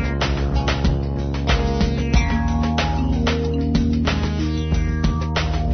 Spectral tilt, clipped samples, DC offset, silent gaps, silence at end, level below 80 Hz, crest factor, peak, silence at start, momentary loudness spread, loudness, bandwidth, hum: -6.5 dB/octave; under 0.1%; under 0.1%; none; 0 s; -22 dBFS; 16 dB; -4 dBFS; 0 s; 3 LU; -21 LUFS; 6.6 kHz; none